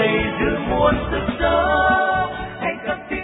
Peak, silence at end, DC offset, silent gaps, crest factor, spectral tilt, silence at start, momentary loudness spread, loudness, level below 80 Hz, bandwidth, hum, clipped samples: -4 dBFS; 0 s; under 0.1%; none; 16 dB; -9.5 dB/octave; 0 s; 9 LU; -19 LUFS; -34 dBFS; 4 kHz; none; under 0.1%